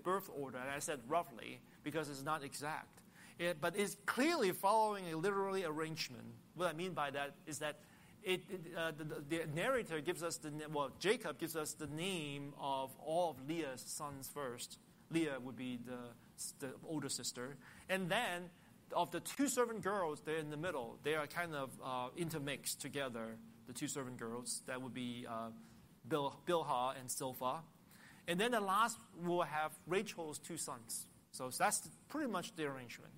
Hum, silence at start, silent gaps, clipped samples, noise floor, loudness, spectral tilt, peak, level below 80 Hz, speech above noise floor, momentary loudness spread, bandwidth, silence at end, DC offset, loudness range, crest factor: none; 0 s; none; under 0.1%; -62 dBFS; -41 LUFS; -3.5 dB/octave; -22 dBFS; -78 dBFS; 21 dB; 12 LU; 16 kHz; 0 s; under 0.1%; 6 LU; 20 dB